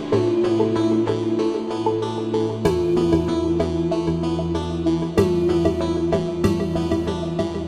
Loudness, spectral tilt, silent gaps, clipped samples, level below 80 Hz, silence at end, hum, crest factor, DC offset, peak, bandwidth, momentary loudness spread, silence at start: -21 LUFS; -7.5 dB/octave; none; under 0.1%; -38 dBFS; 0 s; none; 16 dB; under 0.1%; -4 dBFS; 11.5 kHz; 4 LU; 0 s